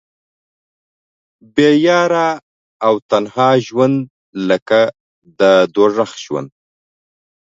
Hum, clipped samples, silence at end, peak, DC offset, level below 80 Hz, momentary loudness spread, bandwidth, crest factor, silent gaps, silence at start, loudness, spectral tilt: none; under 0.1%; 1.1 s; 0 dBFS; under 0.1%; -62 dBFS; 12 LU; 7.8 kHz; 16 dB; 2.43-2.80 s, 3.02-3.09 s, 4.10-4.33 s, 4.62-4.66 s, 5.00-5.22 s; 1.55 s; -14 LUFS; -5.5 dB/octave